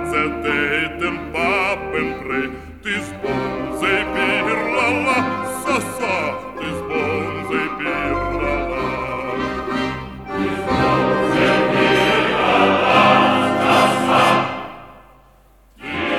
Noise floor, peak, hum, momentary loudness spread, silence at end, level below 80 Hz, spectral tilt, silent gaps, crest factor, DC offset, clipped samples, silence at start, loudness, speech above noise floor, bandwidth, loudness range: -50 dBFS; 0 dBFS; none; 10 LU; 0 s; -40 dBFS; -5 dB/octave; none; 18 dB; 0.2%; under 0.1%; 0 s; -18 LUFS; 30 dB; 16.5 kHz; 7 LU